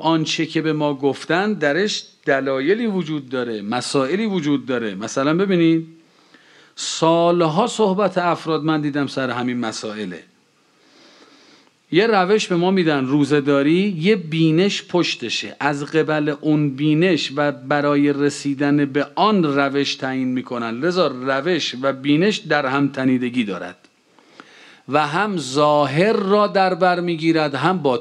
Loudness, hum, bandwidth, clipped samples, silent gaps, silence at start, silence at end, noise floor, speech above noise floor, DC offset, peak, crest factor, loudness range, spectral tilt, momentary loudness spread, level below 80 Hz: -19 LUFS; none; 11 kHz; under 0.1%; none; 0 s; 0 s; -58 dBFS; 40 dB; under 0.1%; -2 dBFS; 18 dB; 4 LU; -5.5 dB/octave; 7 LU; -72 dBFS